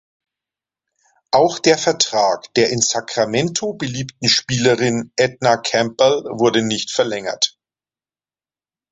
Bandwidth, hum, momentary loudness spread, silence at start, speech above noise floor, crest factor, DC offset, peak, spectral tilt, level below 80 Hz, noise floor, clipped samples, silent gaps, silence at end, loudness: 8.2 kHz; none; 5 LU; 1.35 s; over 73 dB; 18 dB; under 0.1%; 0 dBFS; -3.5 dB/octave; -56 dBFS; under -90 dBFS; under 0.1%; none; 1.45 s; -17 LUFS